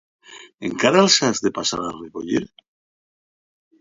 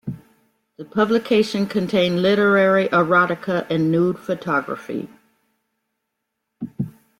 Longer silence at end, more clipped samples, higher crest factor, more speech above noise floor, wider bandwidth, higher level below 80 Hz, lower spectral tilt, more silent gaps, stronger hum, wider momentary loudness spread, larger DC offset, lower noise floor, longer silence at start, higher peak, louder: first, 1.35 s vs 0.3 s; neither; first, 22 dB vs 16 dB; first, over 70 dB vs 59 dB; second, 7.8 kHz vs 15.5 kHz; about the same, -58 dBFS vs -60 dBFS; second, -3 dB/octave vs -6.5 dB/octave; first, 0.54-0.58 s vs none; neither; about the same, 17 LU vs 15 LU; neither; first, under -90 dBFS vs -78 dBFS; first, 0.3 s vs 0.05 s; first, 0 dBFS vs -4 dBFS; about the same, -19 LUFS vs -19 LUFS